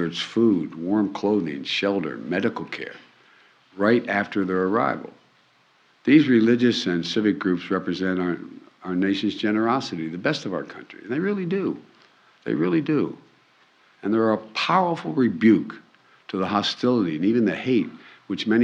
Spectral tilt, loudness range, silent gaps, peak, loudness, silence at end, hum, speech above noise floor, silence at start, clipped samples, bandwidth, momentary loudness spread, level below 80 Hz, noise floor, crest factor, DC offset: -6 dB/octave; 5 LU; none; -4 dBFS; -23 LUFS; 0 s; none; 38 dB; 0 s; under 0.1%; 8.2 kHz; 14 LU; -70 dBFS; -60 dBFS; 18 dB; under 0.1%